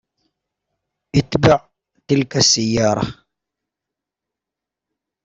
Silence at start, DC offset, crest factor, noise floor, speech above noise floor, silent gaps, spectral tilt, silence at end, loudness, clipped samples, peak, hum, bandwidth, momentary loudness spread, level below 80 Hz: 1.15 s; under 0.1%; 20 dB; -85 dBFS; 70 dB; none; -4 dB/octave; 2.1 s; -17 LUFS; under 0.1%; -2 dBFS; none; 8.2 kHz; 7 LU; -46 dBFS